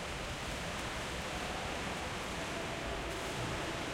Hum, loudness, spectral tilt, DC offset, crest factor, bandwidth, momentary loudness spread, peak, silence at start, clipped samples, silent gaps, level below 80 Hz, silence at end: none; -39 LUFS; -3.5 dB/octave; under 0.1%; 12 dB; 16.5 kHz; 1 LU; -26 dBFS; 0 s; under 0.1%; none; -50 dBFS; 0 s